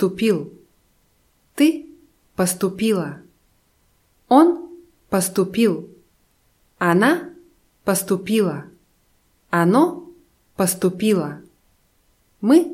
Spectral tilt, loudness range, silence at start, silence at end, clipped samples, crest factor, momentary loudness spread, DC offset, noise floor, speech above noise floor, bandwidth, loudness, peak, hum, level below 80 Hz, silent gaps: -5 dB/octave; 3 LU; 0 s; 0 s; under 0.1%; 18 dB; 18 LU; under 0.1%; -62 dBFS; 44 dB; 16.5 kHz; -20 LUFS; -2 dBFS; none; -60 dBFS; none